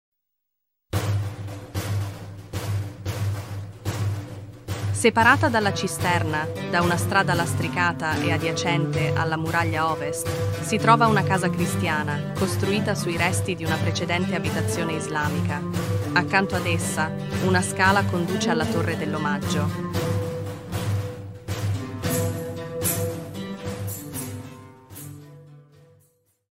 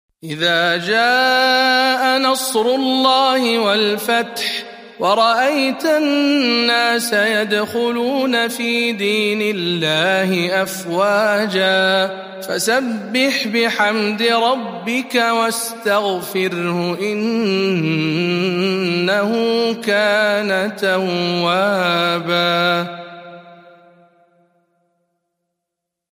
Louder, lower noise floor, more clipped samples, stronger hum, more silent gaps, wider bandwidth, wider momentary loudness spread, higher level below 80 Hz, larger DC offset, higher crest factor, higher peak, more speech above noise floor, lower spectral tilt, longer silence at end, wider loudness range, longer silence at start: second, -24 LUFS vs -16 LUFS; about the same, -81 dBFS vs -80 dBFS; neither; neither; neither; about the same, 16 kHz vs 15.5 kHz; first, 13 LU vs 6 LU; first, -50 dBFS vs -70 dBFS; neither; first, 22 dB vs 16 dB; about the same, -2 dBFS vs -2 dBFS; second, 58 dB vs 64 dB; about the same, -5 dB/octave vs -4 dB/octave; second, 0.9 s vs 2.6 s; first, 8 LU vs 4 LU; first, 0.95 s vs 0.25 s